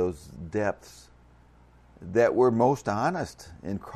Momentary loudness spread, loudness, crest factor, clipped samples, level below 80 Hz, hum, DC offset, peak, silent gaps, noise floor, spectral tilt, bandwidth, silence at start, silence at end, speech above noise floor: 19 LU; -26 LUFS; 18 dB; under 0.1%; -56 dBFS; 60 Hz at -55 dBFS; under 0.1%; -10 dBFS; none; -56 dBFS; -7 dB/octave; 13.5 kHz; 0 s; 0 s; 30 dB